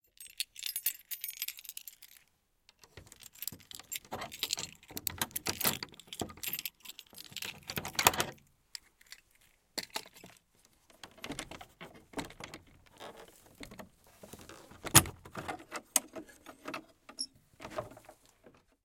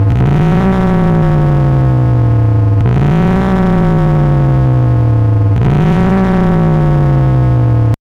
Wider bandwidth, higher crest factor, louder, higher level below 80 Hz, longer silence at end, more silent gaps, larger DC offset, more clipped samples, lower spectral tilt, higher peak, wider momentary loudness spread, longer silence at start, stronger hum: first, 17 kHz vs 6.4 kHz; first, 36 dB vs 8 dB; second, -35 LUFS vs -10 LUFS; second, -62 dBFS vs -20 dBFS; first, 0.35 s vs 0.05 s; neither; neither; neither; second, -2 dB/octave vs -10 dB/octave; about the same, -2 dBFS vs -2 dBFS; first, 22 LU vs 0 LU; first, 0.2 s vs 0 s; neither